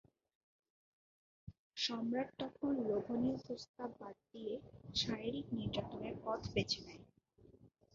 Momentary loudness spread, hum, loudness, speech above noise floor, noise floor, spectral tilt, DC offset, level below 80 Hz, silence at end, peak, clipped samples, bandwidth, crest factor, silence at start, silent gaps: 16 LU; none; -41 LUFS; 25 dB; -67 dBFS; -4 dB/octave; under 0.1%; -66 dBFS; 0.25 s; -22 dBFS; under 0.1%; 7.4 kHz; 20 dB; 1.45 s; 1.59-1.71 s, 3.69-3.74 s